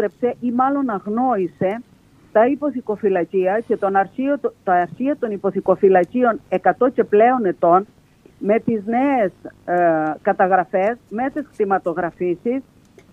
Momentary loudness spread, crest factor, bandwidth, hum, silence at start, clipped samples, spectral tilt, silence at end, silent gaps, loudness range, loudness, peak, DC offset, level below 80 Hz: 8 LU; 16 dB; 6.8 kHz; none; 0 s; under 0.1%; -9 dB/octave; 0.5 s; none; 3 LU; -19 LUFS; -2 dBFS; under 0.1%; -60 dBFS